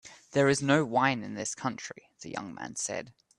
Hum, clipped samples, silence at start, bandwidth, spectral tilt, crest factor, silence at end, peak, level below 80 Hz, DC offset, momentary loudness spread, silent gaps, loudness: none; under 0.1%; 0.05 s; 11.5 kHz; -4.5 dB/octave; 20 dB; 0.3 s; -10 dBFS; -68 dBFS; under 0.1%; 16 LU; none; -29 LUFS